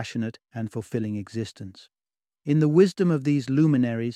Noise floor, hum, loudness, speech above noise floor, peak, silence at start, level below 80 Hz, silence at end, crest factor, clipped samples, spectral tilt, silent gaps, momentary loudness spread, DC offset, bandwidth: -73 dBFS; none; -24 LUFS; 49 dB; -6 dBFS; 0 s; -66 dBFS; 0 s; 18 dB; under 0.1%; -8 dB/octave; none; 16 LU; under 0.1%; 11 kHz